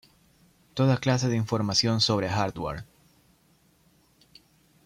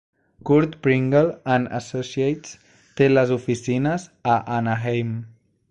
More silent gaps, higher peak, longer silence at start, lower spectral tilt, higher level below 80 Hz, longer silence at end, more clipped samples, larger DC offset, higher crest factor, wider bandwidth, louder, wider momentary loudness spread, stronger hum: neither; second, -10 dBFS vs -6 dBFS; first, 0.75 s vs 0.45 s; second, -5 dB/octave vs -7 dB/octave; about the same, -56 dBFS vs -54 dBFS; first, 2 s vs 0.4 s; neither; neither; about the same, 18 dB vs 16 dB; first, 13.5 kHz vs 9.2 kHz; second, -26 LUFS vs -22 LUFS; about the same, 12 LU vs 12 LU; neither